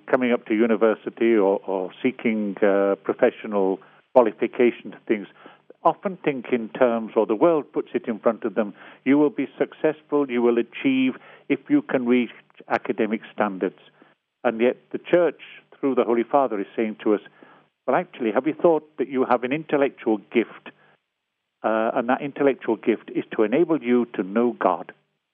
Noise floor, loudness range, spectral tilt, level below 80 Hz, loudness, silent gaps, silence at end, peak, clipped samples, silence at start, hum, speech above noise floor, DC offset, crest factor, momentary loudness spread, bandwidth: -79 dBFS; 3 LU; -5 dB/octave; -84 dBFS; -23 LUFS; none; 0.45 s; -2 dBFS; under 0.1%; 0.05 s; none; 57 dB; under 0.1%; 22 dB; 8 LU; 3.8 kHz